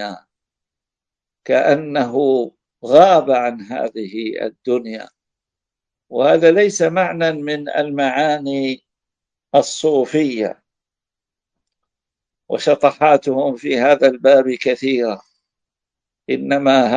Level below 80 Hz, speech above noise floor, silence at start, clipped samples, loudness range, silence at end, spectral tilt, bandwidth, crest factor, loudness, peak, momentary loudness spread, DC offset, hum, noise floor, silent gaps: -66 dBFS; 71 dB; 0 s; under 0.1%; 6 LU; 0 s; -5 dB/octave; 9.6 kHz; 18 dB; -16 LUFS; 0 dBFS; 13 LU; under 0.1%; none; -87 dBFS; none